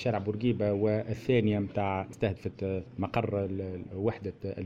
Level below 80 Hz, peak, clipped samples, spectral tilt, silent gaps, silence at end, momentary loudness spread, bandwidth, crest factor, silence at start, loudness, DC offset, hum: -56 dBFS; -14 dBFS; under 0.1%; -8.5 dB/octave; none; 0 s; 8 LU; 8 kHz; 18 dB; 0 s; -31 LUFS; under 0.1%; none